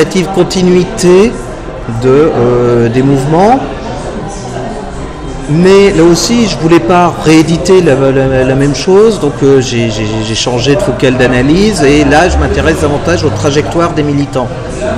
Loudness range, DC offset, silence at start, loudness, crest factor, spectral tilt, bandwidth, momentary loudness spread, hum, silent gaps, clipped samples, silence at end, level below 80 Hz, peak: 3 LU; under 0.1%; 0 s; -8 LUFS; 8 dB; -5.5 dB/octave; 13.5 kHz; 13 LU; none; none; 2%; 0 s; -24 dBFS; 0 dBFS